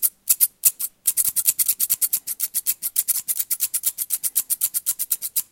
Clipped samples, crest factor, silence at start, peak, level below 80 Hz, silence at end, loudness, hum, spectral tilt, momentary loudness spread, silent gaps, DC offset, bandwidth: under 0.1%; 24 dB; 0 s; 0 dBFS; -70 dBFS; 0.1 s; -20 LUFS; none; 3.5 dB/octave; 5 LU; none; under 0.1%; 17.5 kHz